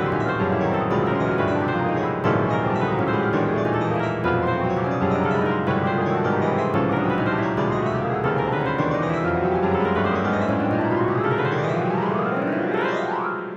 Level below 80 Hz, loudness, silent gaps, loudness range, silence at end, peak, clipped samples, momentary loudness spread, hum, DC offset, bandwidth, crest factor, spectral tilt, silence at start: -48 dBFS; -22 LUFS; none; 0 LU; 0 s; -8 dBFS; under 0.1%; 2 LU; none; under 0.1%; 7.6 kHz; 14 dB; -8 dB/octave; 0 s